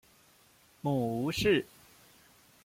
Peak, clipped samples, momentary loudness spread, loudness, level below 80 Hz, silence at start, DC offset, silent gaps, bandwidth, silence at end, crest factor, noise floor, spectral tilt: -16 dBFS; under 0.1%; 10 LU; -31 LUFS; -58 dBFS; 0.85 s; under 0.1%; none; 16.5 kHz; 1 s; 18 dB; -63 dBFS; -5.5 dB/octave